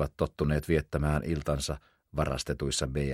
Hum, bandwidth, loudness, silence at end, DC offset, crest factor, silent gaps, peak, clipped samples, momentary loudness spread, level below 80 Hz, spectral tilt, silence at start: none; 15.5 kHz; -31 LUFS; 0 s; under 0.1%; 18 dB; none; -12 dBFS; under 0.1%; 6 LU; -40 dBFS; -5.5 dB/octave; 0 s